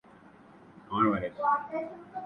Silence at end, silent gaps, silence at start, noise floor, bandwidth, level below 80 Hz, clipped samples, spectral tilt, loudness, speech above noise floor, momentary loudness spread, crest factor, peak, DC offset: 0 s; none; 0.7 s; -55 dBFS; 5.8 kHz; -62 dBFS; under 0.1%; -8.5 dB/octave; -30 LUFS; 25 dB; 10 LU; 20 dB; -12 dBFS; under 0.1%